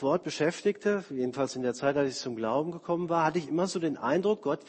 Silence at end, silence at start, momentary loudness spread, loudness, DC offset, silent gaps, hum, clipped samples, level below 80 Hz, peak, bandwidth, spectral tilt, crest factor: 0.05 s; 0 s; 4 LU; -30 LUFS; under 0.1%; none; none; under 0.1%; -68 dBFS; -14 dBFS; 8.8 kHz; -5.5 dB/octave; 16 dB